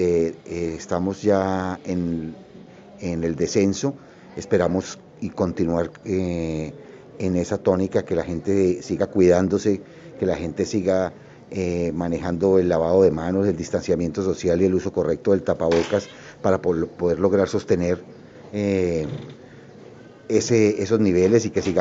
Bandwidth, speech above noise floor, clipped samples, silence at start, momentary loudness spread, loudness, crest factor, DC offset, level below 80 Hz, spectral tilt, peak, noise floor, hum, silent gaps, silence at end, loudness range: 7.8 kHz; 23 dB; under 0.1%; 0 s; 12 LU; -22 LUFS; 18 dB; under 0.1%; -48 dBFS; -6.5 dB/octave; -4 dBFS; -44 dBFS; none; none; 0 s; 4 LU